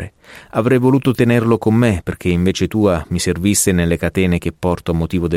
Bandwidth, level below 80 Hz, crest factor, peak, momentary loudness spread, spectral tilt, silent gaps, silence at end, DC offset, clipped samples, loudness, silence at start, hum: 16.5 kHz; -36 dBFS; 14 dB; -2 dBFS; 6 LU; -5.5 dB/octave; none; 0 s; under 0.1%; under 0.1%; -16 LUFS; 0 s; none